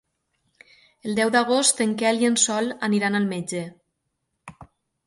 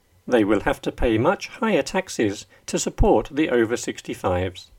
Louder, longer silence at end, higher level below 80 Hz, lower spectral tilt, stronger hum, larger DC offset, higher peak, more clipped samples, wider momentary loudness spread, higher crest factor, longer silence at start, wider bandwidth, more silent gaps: about the same, -21 LUFS vs -22 LUFS; first, 0.4 s vs 0.15 s; second, -66 dBFS vs -34 dBFS; second, -3 dB/octave vs -5 dB/octave; neither; neither; about the same, -4 dBFS vs -4 dBFS; neither; first, 12 LU vs 7 LU; about the same, 20 dB vs 18 dB; first, 1.05 s vs 0.25 s; second, 11.5 kHz vs 16.5 kHz; neither